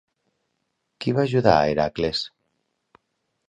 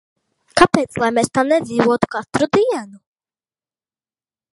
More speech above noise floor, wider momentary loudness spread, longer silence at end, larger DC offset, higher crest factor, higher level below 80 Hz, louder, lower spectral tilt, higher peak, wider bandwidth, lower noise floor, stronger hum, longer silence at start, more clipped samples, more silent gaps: second, 55 dB vs over 74 dB; first, 11 LU vs 6 LU; second, 1.2 s vs 1.55 s; neither; about the same, 24 dB vs 20 dB; about the same, -50 dBFS vs -50 dBFS; second, -22 LUFS vs -17 LUFS; first, -6.5 dB/octave vs -5 dB/octave; about the same, -2 dBFS vs 0 dBFS; second, 9.8 kHz vs 12 kHz; second, -76 dBFS vs under -90 dBFS; neither; first, 1 s vs 0.55 s; neither; neither